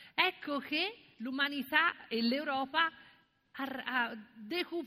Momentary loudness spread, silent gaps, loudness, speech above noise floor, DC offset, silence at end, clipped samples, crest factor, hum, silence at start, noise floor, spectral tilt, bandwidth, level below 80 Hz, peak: 12 LU; none; -33 LUFS; 30 dB; under 0.1%; 0 s; under 0.1%; 22 dB; none; 0 s; -65 dBFS; -4 dB/octave; 15.5 kHz; -80 dBFS; -12 dBFS